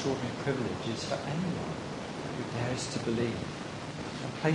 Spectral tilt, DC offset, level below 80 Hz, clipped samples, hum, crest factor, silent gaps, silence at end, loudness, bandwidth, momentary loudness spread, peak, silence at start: -5.5 dB/octave; under 0.1%; -58 dBFS; under 0.1%; none; 20 dB; none; 0 s; -34 LUFS; 10.5 kHz; 6 LU; -12 dBFS; 0 s